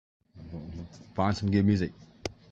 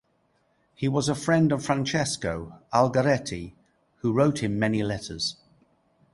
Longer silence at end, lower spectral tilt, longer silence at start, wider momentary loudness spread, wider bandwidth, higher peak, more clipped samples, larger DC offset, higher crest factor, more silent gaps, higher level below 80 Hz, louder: second, 0.2 s vs 0.8 s; first, -7 dB/octave vs -5.5 dB/octave; second, 0.35 s vs 0.8 s; first, 18 LU vs 10 LU; second, 7.8 kHz vs 11.5 kHz; second, -12 dBFS vs -6 dBFS; neither; neither; about the same, 18 dB vs 20 dB; neither; about the same, -56 dBFS vs -54 dBFS; about the same, -28 LUFS vs -26 LUFS